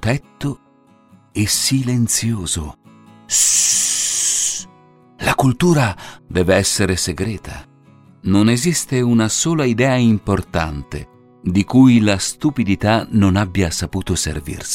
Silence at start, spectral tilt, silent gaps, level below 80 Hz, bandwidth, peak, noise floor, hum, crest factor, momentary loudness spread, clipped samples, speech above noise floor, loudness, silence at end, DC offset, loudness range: 0 s; -4 dB/octave; none; -38 dBFS; 16.5 kHz; 0 dBFS; -51 dBFS; none; 16 dB; 14 LU; under 0.1%; 34 dB; -16 LUFS; 0 s; under 0.1%; 3 LU